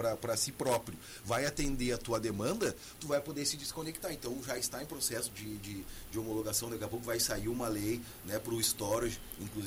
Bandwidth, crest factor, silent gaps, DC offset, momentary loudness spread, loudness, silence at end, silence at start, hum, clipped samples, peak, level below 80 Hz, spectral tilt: 16 kHz; 18 dB; none; under 0.1%; 10 LU; -36 LUFS; 0 s; 0 s; none; under 0.1%; -18 dBFS; -52 dBFS; -3.5 dB/octave